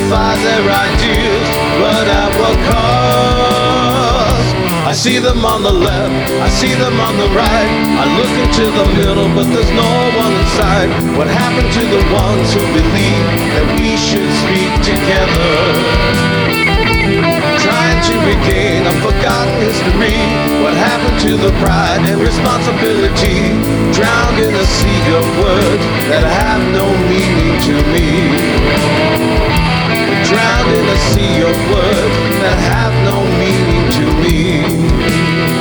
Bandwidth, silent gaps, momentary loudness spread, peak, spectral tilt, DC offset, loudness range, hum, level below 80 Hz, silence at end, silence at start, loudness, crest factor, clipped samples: over 20 kHz; none; 2 LU; 0 dBFS; -5 dB/octave; under 0.1%; 1 LU; none; -20 dBFS; 0 s; 0 s; -11 LUFS; 10 dB; under 0.1%